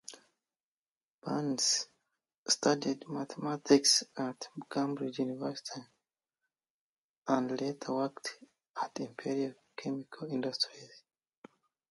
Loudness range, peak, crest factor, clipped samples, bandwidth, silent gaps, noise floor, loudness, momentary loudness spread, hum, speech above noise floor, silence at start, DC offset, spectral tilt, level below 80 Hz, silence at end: 8 LU; -12 dBFS; 24 dB; under 0.1%; 11.5 kHz; 0.63-1.22 s, 2.38-2.46 s, 6.70-7.22 s, 8.69-8.74 s; under -90 dBFS; -33 LUFS; 17 LU; none; over 56 dB; 0.1 s; under 0.1%; -3 dB/octave; -84 dBFS; 0.9 s